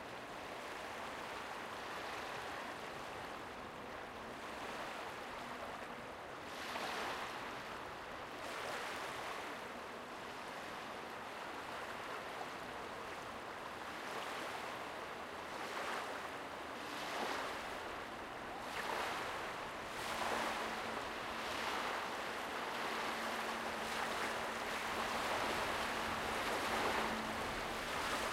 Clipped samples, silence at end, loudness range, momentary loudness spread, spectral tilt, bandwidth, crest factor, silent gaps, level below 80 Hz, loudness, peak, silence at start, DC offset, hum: under 0.1%; 0 s; 8 LU; 9 LU; -2.5 dB/octave; 16 kHz; 20 dB; none; -66 dBFS; -43 LUFS; -24 dBFS; 0 s; under 0.1%; none